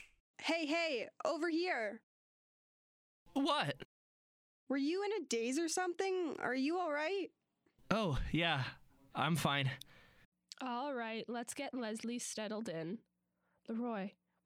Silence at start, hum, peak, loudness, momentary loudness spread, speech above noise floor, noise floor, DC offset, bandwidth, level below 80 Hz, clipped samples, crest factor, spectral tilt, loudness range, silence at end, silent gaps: 0 s; none; -18 dBFS; -38 LUFS; 12 LU; 44 dB; -82 dBFS; under 0.1%; 16 kHz; -60 dBFS; under 0.1%; 22 dB; -4.5 dB/octave; 5 LU; 0.35 s; 0.20-0.34 s, 2.03-3.26 s, 3.85-4.67 s, 10.25-10.32 s